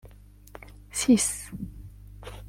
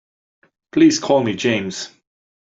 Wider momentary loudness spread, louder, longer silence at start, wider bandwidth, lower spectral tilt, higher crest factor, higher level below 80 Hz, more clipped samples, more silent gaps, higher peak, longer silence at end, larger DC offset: first, 26 LU vs 15 LU; second, -25 LUFS vs -17 LUFS; second, 0.05 s vs 0.75 s; first, 16.5 kHz vs 7.8 kHz; about the same, -3.5 dB/octave vs -4.5 dB/octave; about the same, 20 dB vs 16 dB; first, -48 dBFS vs -60 dBFS; neither; neither; second, -10 dBFS vs -4 dBFS; second, 0 s vs 0.65 s; neither